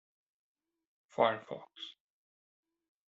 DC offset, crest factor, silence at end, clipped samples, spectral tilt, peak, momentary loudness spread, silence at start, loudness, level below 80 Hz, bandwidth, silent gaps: under 0.1%; 26 dB; 1.15 s; under 0.1%; -2 dB/octave; -14 dBFS; 17 LU; 1.2 s; -33 LUFS; -84 dBFS; 7.6 kHz; none